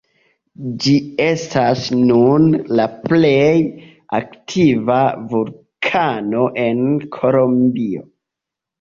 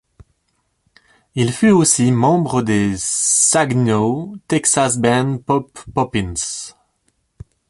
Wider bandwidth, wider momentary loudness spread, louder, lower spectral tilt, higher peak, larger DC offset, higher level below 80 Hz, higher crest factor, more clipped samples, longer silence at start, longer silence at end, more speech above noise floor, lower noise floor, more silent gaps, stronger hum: second, 7.4 kHz vs 12 kHz; about the same, 11 LU vs 11 LU; about the same, -16 LUFS vs -16 LUFS; first, -6.5 dB/octave vs -4.5 dB/octave; about the same, -2 dBFS vs -2 dBFS; neither; second, -54 dBFS vs -46 dBFS; about the same, 14 dB vs 16 dB; neither; second, 0.6 s vs 1.35 s; second, 0.8 s vs 1 s; first, 69 dB vs 51 dB; first, -84 dBFS vs -67 dBFS; neither; neither